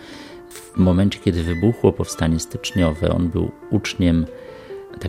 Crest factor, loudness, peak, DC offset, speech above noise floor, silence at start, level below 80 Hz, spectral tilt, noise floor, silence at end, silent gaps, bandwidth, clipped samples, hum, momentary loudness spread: 20 dB; -20 LUFS; 0 dBFS; under 0.1%; 20 dB; 0 s; -40 dBFS; -6.5 dB/octave; -39 dBFS; 0 s; none; 16 kHz; under 0.1%; none; 19 LU